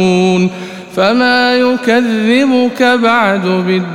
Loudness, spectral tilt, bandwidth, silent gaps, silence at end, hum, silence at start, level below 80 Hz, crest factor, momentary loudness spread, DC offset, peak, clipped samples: -11 LUFS; -5.5 dB/octave; 15 kHz; none; 0 s; none; 0 s; -54 dBFS; 10 dB; 5 LU; 0.4%; 0 dBFS; under 0.1%